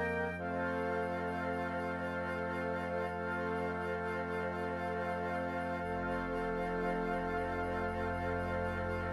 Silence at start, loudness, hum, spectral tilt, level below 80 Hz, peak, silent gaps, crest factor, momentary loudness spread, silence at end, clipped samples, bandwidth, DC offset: 0 s; -37 LUFS; none; -7.5 dB/octave; -54 dBFS; -24 dBFS; none; 12 dB; 2 LU; 0 s; under 0.1%; 13 kHz; under 0.1%